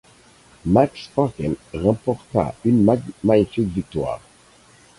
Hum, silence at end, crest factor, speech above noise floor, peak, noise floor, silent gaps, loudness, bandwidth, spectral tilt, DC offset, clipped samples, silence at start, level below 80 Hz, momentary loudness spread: none; 0.8 s; 18 dB; 32 dB; -2 dBFS; -51 dBFS; none; -21 LUFS; 11.5 kHz; -8.5 dB/octave; under 0.1%; under 0.1%; 0.65 s; -44 dBFS; 9 LU